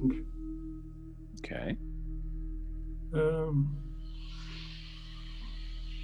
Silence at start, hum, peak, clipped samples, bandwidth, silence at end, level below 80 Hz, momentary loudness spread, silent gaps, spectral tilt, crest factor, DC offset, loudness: 0 s; none; -18 dBFS; under 0.1%; 9.4 kHz; 0 s; -40 dBFS; 16 LU; none; -8 dB/octave; 18 dB; under 0.1%; -38 LUFS